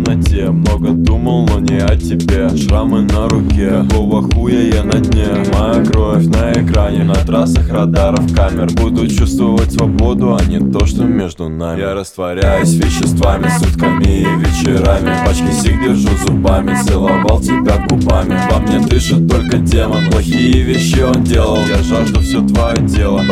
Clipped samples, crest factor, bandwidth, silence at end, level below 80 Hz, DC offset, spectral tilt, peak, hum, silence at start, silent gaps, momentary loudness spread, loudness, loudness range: under 0.1%; 10 dB; 15 kHz; 0 s; -16 dBFS; under 0.1%; -6.5 dB/octave; 0 dBFS; none; 0 s; none; 2 LU; -12 LUFS; 2 LU